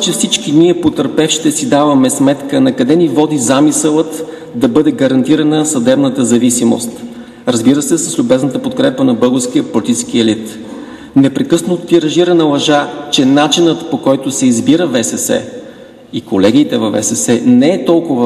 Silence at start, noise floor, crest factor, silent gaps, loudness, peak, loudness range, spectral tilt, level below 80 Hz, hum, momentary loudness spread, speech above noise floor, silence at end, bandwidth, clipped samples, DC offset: 0 s; -33 dBFS; 12 dB; none; -11 LUFS; 0 dBFS; 2 LU; -4.5 dB/octave; -52 dBFS; none; 8 LU; 23 dB; 0 s; 13 kHz; 0.1%; under 0.1%